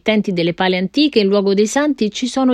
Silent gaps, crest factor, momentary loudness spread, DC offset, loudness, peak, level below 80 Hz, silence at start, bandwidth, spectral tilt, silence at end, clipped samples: none; 14 dB; 4 LU; under 0.1%; -16 LUFS; -2 dBFS; -54 dBFS; 0.05 s; 12 kHz; -5 dB/octave; 0 s; under 0.1%